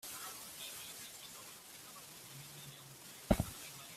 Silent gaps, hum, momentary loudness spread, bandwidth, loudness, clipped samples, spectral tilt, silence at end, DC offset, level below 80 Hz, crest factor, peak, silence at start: none; none; 15 LU; 16 kHz; -44 LUFS; under 0.1%; -4 dB/octave; 0 s; under 0.1%; -54 dBFS; 30 dB; -14 dBFS; 0 s